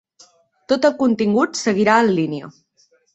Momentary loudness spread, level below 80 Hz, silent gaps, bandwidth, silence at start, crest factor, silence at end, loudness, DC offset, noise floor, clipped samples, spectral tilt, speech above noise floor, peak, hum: 8 LU; -62 dBFS; none; 8.2 kHz; 0.7 s; 18 dB; 0.65 s; -17 LUFS; under 0.1%; -60 dBFS; under 0.1%; -5 dB/octave; 43 dB; -2 dBFS; none